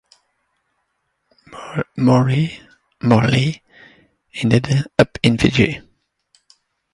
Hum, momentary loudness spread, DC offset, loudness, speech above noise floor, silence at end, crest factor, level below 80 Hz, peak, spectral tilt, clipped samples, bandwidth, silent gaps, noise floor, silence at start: none; 18 LU; under 0.1%; -17 LUFS; 55 dB; 1.15 s; 20 dB; -44 dBFS; 0 dBFS; -6.5 dB/octave; under 0.1%; 11.5 kHz; none; -71 dBFS; 1.5 s